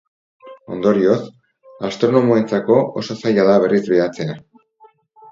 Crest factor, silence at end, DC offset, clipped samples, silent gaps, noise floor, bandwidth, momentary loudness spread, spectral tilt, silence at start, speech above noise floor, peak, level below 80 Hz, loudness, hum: 18 dB; 0.9 s; under 0.1%; under 0.1%; none; -52 dBFS; 7.6 kHz; 14 LU; -7 dB/octave; 0.45 s; 36 dB; 0 dBFS; -60 dBFS; -17 LUFS; none